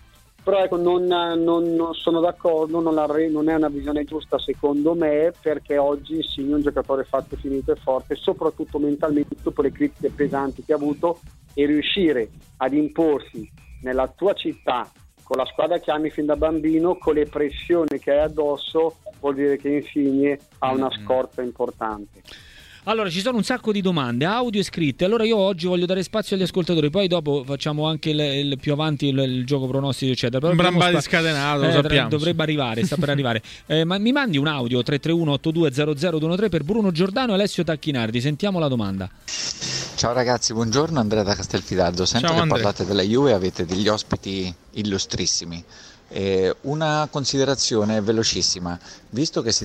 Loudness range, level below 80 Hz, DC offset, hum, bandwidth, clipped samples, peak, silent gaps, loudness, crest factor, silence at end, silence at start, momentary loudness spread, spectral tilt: 4 LU; -46 dBFS; under 0.1%; none; 14.5 kHz; under 0.1%; -2 dBFS; none; -22 LUFS; 20 dB; 0 s; 0.45 s; 7 LU; -5 dB/octave